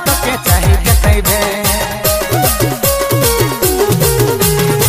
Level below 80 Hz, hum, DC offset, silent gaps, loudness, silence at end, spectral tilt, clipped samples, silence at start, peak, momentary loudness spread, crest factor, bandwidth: -20 dBFS; none; under 0.1%; none; -12 LUFS; 0 s; -4 dB/octave; under 0.1%; 0 s; 0 dBFS; 3 LU; 12 dB; 16 kHz